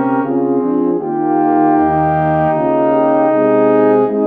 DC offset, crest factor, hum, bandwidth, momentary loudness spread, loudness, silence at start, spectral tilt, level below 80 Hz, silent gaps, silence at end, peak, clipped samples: under 0.1%; 10 dB; none; 3.9 kHz; 4 LU; -13 LUFS; 0 s; -11 dB/octave; -46 dBFS; none; 0 s; -2 dBFS; under 0.1%